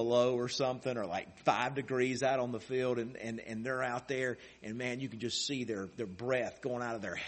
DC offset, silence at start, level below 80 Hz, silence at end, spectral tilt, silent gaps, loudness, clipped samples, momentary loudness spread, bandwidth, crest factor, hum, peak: under 0.1%; 0 s; -70 dBFS; 0 s; -4.5 dB/octave; none; -35 LUFS; under 0.1%; 8 LU; 8.4 kHz; 22 dB; none; -12 dBFS